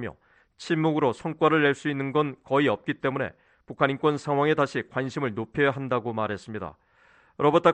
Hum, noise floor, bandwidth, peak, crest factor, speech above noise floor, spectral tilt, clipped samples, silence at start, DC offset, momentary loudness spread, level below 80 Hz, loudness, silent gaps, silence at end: none; -60 dBFS; 9.2 kHz; -6 dBFS; 20 dB; 35 dB; -6.5 dB/octave; under 0.1%; 0 s; under 0.1%; 11 LU; -62 dBFS; -26 LUFS; none; 0 s